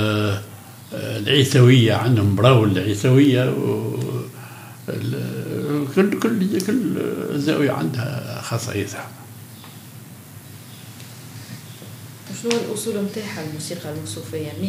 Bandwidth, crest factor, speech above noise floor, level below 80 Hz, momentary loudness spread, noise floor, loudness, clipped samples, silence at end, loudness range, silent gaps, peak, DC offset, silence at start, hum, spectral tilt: 16 kHz; 20 dB; 21 dB; -66 dBFS; 24 LU; -40 dBFS; -20 LUFS; under 0.1%; 0 s; 15 LU; none; 0 dBFS; under 0.1%; 0 s; none; -6 dB/octave